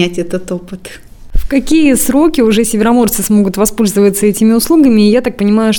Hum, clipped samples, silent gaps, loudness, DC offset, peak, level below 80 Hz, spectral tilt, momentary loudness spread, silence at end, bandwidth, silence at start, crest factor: none; under 0.1%; none; -10 LUFS; under 0.1%; 0 dBFS; -26 dBFS; -5 dB/octave; 14 LU; 0 s; 19.5 kHz; 0 s; 10 dB